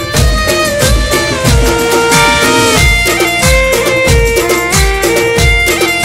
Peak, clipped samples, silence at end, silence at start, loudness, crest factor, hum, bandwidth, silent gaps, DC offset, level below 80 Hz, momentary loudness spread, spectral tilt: 0 dBFS; under 0.1%; 0 s; 0 s; -9 LUFS; 10 dB; none; 16.5 kHz; none; under 0.1%; -16 dBFS; 3 LU; -3.5 dB/octave